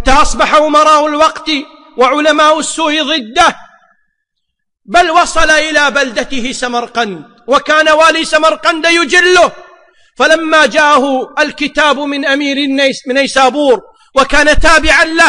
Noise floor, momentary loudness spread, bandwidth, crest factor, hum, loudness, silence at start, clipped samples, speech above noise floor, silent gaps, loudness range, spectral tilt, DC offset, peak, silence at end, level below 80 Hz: -70 dBFS; 9 LU; 10.5 kHz; 10 dB; none; -9 LUFS; 0 s; under 0.1%; 61 dB; none; 3 LU; -2 dB/octave; under 0.1%; 0 dBFS; 0 s; -26 dBFS